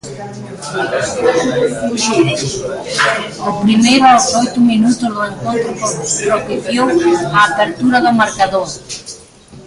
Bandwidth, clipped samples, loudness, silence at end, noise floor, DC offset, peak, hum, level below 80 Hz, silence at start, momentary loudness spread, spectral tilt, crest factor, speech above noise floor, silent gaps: 11.5 kHz; under 0.1%; -13 LUFS; 0 s; -38 dBFS; under 0.1%; 0 dBFS; none; -46 dBFS; 0.05 s; 13 LU; -3.5 dB/octave; 14 dB; 25 dB; none